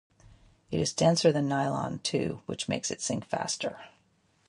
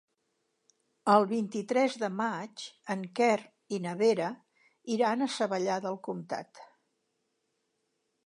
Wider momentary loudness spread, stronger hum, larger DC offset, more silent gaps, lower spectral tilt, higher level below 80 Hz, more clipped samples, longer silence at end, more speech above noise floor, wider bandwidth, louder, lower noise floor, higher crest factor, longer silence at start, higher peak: second, 11 LU vs 14 LU; neither; neither; neither; about the same, -4.5 dB/octave vs -5 dB/octave; first, -60 dBFS vs -86 dBFS; neither; second, 0.6 s vs 1.6 s; second, 39 dB vs 50 dB; about the same, 11.5 kHz vs 11 kHz; about the same, -29 LUFS vs -30 LUFS; second, -68 dBFS vs -79 dBFS; about the same, 20 dB vs 22 dB; second, 0.7 s vs 1.05 s; about the same, -10 dBFS vs -10 dBFS